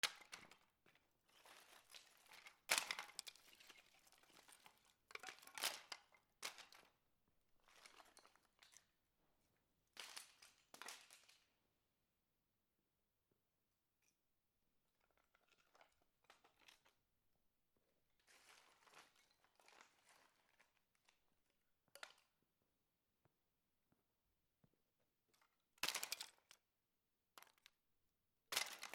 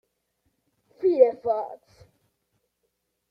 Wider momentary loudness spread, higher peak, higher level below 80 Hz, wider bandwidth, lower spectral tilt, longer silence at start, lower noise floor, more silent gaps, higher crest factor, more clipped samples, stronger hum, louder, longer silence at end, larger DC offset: first, 24 LU vs 11 LU; second, -20 dBFS vs -4 dBFS; second, under -90 dBFS vs -72 dBFS; first, 19 kHz vs 5.2 kHz; second, 1.5 dB/octave vs -8 dB/octave; second, 0.05 s vs 1 s; first, under -90 dBFS vs -77 dBFS; neither; first, 38 dB vs 24 dB; neither; neither; second, -49 LUFS vs -23 LUFS; second, 0 s vs 1.55 s; neither